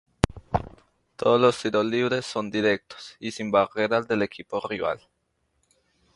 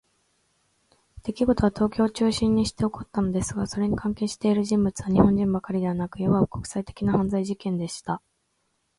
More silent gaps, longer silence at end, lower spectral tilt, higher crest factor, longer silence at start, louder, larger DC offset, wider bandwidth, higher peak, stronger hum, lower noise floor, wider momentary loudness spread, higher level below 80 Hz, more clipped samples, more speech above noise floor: neither; first, 1.2 s vs 0.8 s; about the same, -5.5 dB/octave vs -6.5 dB/octave; first, 26 dB vs 20 dB; second, 0.35 s vs 1.15 s; about the same, -25 LUFS vs -25 LUFS; neither; about the same, 11.5 kHz vs 11.5 kHz; first, 0 dBFS vs -6 dBFS; neither; about the same, -73 dBFS vs -73 dBFS; first, 12 LU vs 9 LU; about the same, -48 dBFS vs -46 dBFS; neither; about the same, 48 dB vs 49 dB